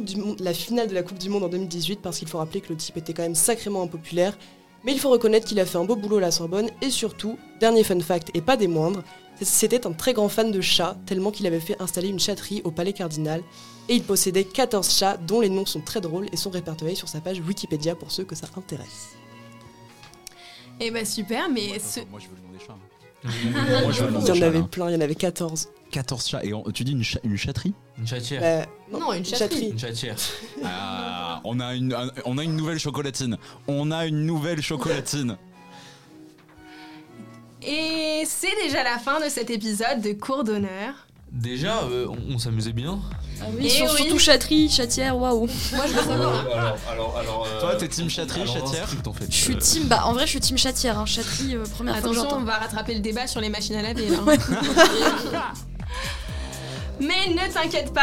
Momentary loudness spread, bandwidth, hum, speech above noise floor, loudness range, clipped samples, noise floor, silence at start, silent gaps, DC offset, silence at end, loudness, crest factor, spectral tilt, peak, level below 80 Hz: 13 LU; 17 kHz; none; 24 dB; 8 LU; under 0.1%; -48 dBFS; 0 s; none; 0.3%; 0 s; -24 LUFS; 24 dB; -3.5 dB/octave; 0 dBFS; -42 dBFS